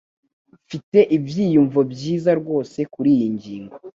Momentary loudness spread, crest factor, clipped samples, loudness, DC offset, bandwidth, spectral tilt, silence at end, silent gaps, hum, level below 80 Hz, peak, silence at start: 18 LU; 18 dB; under 0.1%; -19 LUFS; under 0.1%; 7.6 kHz; -8 dB/octave; 0.05 s; 0.83-0.92 s; none; -60 dBFS; -2 dBFS; 0.7 s